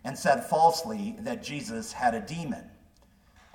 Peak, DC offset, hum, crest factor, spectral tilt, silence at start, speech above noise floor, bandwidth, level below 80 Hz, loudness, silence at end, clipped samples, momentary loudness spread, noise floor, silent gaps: -8 dBFS; under 0.1%; none; 20 dB; -4.5 dB/octave; 0.05 s; 32 dB; 18 kHz; -60 dBFS; -28 LUFS; 0.85 s; under 0.1%; 13 LU; -60 dBFS; none